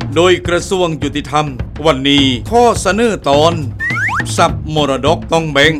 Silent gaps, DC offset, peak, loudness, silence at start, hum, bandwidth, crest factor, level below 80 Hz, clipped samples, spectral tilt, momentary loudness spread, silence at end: none; under 0.1%; 0 dBFS; -13 LUFS; 0 s; none; 15.5 kHz; 12 dB; -30 dBFS; 0.1%; -4.5 dB/octave; 6 LU; 0 s